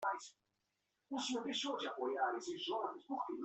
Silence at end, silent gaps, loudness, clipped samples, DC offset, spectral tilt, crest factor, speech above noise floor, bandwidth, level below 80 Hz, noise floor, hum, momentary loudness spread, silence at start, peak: 0 s; none; -41 LUFS; under 0.1%; under 0.1%; -2 dB/octave; 16 dB; 45 dB; 8.4 kHz; -88 dBFS; -86 dBFS; none; 7 LU; 0 s; -26 dBFS